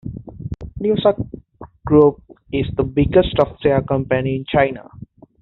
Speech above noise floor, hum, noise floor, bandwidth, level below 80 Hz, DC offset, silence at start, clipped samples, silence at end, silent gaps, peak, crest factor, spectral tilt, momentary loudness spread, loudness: 24 dB; none; -41 dBFS; 4.3 kHz; -38 dBFS; under 0.1%; 0.05 s; under 0.1%; 0.4 s; none; -2 dBFS; 16 dB; -6 dB/octave; 18 LU; -18 LUFS